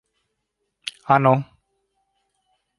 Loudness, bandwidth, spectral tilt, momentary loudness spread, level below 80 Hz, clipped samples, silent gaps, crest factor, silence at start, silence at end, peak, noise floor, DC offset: -19 LUFS; 11.5 kHz; -7 dB/octave; 18 LU; -66 dBFS; under 0.1%; none; 22 dB; 0.85 s; 1.35 s; -2 dBFS; -77 dBFS; under 0.1%